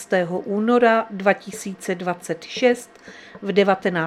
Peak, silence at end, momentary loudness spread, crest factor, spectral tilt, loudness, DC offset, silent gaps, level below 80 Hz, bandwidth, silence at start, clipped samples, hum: -2 dBFS; 0 s; 14 LU; 20 dB; -5 dB/octave; -21 LUFS; under 0.1%; none; -68 dBFS; 14 kHz; 0 s; under 0.1%; none